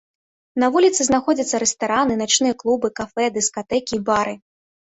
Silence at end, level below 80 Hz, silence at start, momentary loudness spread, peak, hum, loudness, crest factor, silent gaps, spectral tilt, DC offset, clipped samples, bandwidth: 0.6 s; -54 dBFS; 0.55 s; 8 LU; -4 dBFS; none; -19 LUFS; 16 dB; none; -2.5 dB/octave; under 0.1%; under 0.1%; 8.4 kHz